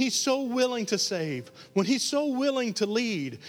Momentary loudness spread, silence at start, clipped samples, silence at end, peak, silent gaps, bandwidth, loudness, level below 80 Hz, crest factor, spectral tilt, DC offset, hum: 6 LU; 0 s; under 0.1%; 0 s; -12 dBFS; none; 17 kHz; -27 LUFS; -78 dBFS; 16 dB; -3.5 dB/octave; under 0.1%; none